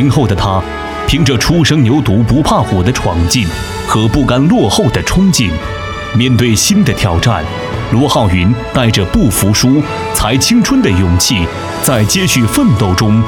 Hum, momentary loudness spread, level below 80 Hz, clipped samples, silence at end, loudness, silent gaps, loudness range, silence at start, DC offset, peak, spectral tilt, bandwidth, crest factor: none; 6 LU; -26 dBFS; under 0.1%; 0 s; -11 LUFS; none; 1 LU; 0 s; under 0.1%; 0 dBFS; -5 dB/octave; 18.5 kHz; 10 dB